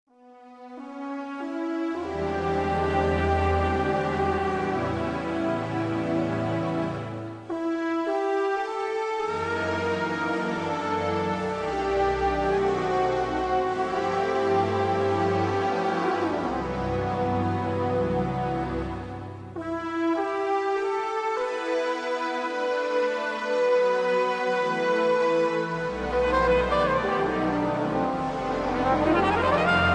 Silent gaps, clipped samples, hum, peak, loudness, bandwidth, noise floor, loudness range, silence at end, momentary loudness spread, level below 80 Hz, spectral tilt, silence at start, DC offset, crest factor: none; under 0.1%; none; -10 dBFS; -26 LUFS; 10.5 kHz; -50 dBFS; 4 LU; 0 s; 7 LU; -44 dBFS; -6.5 dB/octave; 0.25 s; under 0.1%; 16 dB